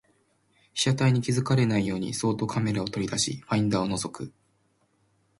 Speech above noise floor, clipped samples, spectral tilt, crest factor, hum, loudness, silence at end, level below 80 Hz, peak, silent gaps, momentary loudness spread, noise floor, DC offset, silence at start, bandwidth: 43 dB; under 0.1%; -5 dB/octave; 16 dB; none; -26 LUFS; 1.1 s; -58 dBFS; -12 dBFS; none; 9 LU; -69 dBFS; under 0.1%; 0.75 s; 11.5 kHz